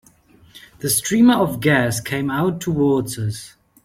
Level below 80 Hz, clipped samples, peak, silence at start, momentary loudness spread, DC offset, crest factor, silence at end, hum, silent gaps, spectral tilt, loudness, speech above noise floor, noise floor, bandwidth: -52 dBFS; under 0.1%; -2 dBFS; 0.55 s; 12 LU; under 0.1%; 18 dB; 0.35 s; none; none; -5 dB/octave; -18 LUFS; 33 dB; -51 dBFS; 16.5 kHz